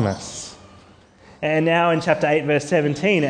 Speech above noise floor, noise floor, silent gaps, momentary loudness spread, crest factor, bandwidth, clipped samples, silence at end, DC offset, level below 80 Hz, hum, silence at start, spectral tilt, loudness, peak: 30 dB; -49 dBFS; none; 14 LU; 18 dB; 10 kHz; under 0.1%; 0 s; under 0.1%; -58 dBFS; none; 0 s; -5.5 dB/octave; -20 LUFS; -4 dBFS